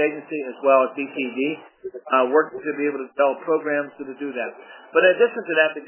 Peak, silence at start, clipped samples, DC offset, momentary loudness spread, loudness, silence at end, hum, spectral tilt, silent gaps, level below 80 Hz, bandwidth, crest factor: -2 dBFS; 0 s; under 0.1%; under 0.1%; 14 LU; -22 LUFS; 0 s; none; -8 dB/octave; none; -82 dBFS; 3.2 kHz; 20 dB